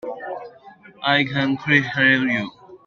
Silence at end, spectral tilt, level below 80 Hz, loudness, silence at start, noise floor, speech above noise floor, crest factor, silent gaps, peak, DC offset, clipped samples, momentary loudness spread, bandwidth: 0.1 s; -6 dB/octave; -62 dBFS; -19 LUFS; 0.05 s; -46 dBFS; 27 dB; 20 dB; none; -2 dBFS; under 0.1%; under 0.1%; 17 LU; 7 kHz